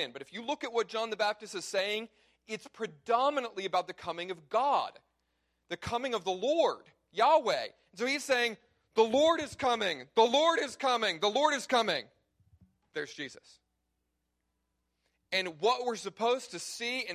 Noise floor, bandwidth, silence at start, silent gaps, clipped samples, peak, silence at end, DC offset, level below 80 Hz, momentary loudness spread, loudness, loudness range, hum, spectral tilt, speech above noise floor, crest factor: -82 dBFS; 15 kHz; 0 s; none; under 0.1%; -12 dBFS; 0 s; under 0.1%; -70 dBFS; 15 LU; -31 LUFS; 8 LU; none; -2.5 dB/octave; 51 dB; 20 dB